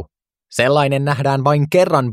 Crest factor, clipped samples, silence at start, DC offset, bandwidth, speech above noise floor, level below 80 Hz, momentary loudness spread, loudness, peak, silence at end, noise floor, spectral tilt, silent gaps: 16 dB; under 0.1%; 0 s; under 0.1%; 14.5 kHz; 27 dB; -54 dBFS; 4 LU; -16 LUFS; 0 dBFS; 0 s; -41 dBFS; -6 dB/octave; none